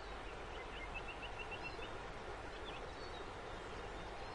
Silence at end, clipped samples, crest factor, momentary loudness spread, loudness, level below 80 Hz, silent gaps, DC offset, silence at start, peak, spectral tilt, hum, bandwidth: 0 s; under 0.1%; 14 dB; 3 LU; -48 LUFS; -56 dBFS; none; under 0.1%; 0 s; -34 dBFS; -4.5 dB/octave; none; 11 kHz